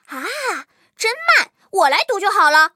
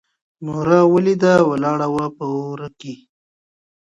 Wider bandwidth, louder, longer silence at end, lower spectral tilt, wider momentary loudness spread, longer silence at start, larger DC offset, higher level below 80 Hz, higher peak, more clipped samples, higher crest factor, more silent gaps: first, 16.5 kHz vs 8.6 kHz; about the same, -16 LUFS vs -17 LUFS; second, 0.05 s vs 1 s; second, 1 dB/octave vs -7.5 dB/octave; second, 11 LU vs 19 LU; second, 0.1 s vs 0.4 s; neither; second, -84 dBFS vs -56 dBFS; about the same, -2 dBFS vs 0 dBFS; neither; about the same, 16 dB vs 18 dB; neither